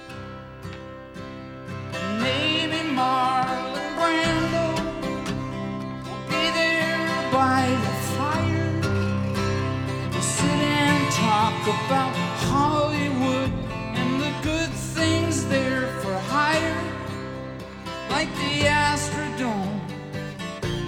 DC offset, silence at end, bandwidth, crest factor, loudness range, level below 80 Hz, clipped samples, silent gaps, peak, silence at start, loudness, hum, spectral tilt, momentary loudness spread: under 0.1%; 0 s; 17.5 kHz; 18 dB; 3 LU; -46 dBFS; under 0.1%; none; -6 dBFS; 0 s; -24 LUFS; none; -4.5 dB/octave; 13 LU